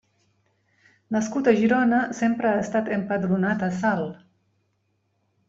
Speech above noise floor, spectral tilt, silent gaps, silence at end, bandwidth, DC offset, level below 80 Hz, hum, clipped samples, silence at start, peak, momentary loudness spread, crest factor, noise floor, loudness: 49 dB; -6.5 dB/octave; none; 1.3 s; 7.8 kHz; under 0.1%; -64 dBFS; none; under 0.1%; 1.1 s; -6 dBFS; 8 LU; 18 dB; -71 dBFS; -23 LUFS